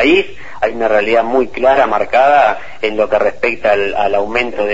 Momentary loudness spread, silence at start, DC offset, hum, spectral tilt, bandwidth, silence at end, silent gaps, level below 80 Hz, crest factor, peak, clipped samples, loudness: 8 LU; 0 s; 5%; none; -5 dB/octave; 8 kHz; 0 s; none; -42 dBFS; 14 dB; 0 dBFS; under 0.1%; -13 LUFS